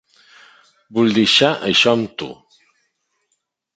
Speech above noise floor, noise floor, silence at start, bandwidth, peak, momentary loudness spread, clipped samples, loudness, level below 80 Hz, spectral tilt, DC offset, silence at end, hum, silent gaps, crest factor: 56 dB; -72 dBFS; 0.9 s; 9.2 kHz; -2 dBFS; 16 LU; under 0.1%; -15 LUFS; -58 dBFS; -4 dB/octave; under 0.1%; 1.45 s; none; none; 18 dB